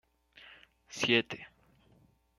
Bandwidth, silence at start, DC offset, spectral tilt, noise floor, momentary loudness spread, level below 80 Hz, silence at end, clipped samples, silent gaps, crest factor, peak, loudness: 12.5 kHz; 0.45 s; under 0.1%; -3.5 dB/octave; -66 dBFS; 26 LU; -72 dBFS; 0.9 s; under 0.1%; none; 26 dB; -10 dBFS; -30 LUFS